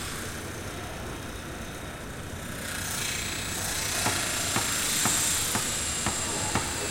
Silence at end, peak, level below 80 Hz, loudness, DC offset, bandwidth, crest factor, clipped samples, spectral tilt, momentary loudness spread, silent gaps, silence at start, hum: 0 s; -10 dBFS; -46 dBFS; -28 LUFS; under 0.1%; 16.5 kHz; 20 dB; under 0.1%; -2 dB/octave; 14 LU; none; 0 s; none